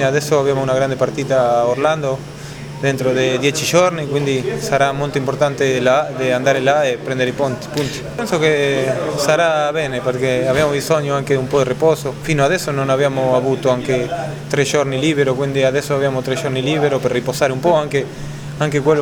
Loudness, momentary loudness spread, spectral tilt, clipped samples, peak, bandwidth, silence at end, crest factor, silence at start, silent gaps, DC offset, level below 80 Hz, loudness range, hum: -17 LUFS; 6 LU; -5 dB/octave; under 0.1%; 0 dBFS; 19.5 kHz; 0 s; 16 dB; 0 s; none; under 0.1%; -46 dBFS; 1 LU; none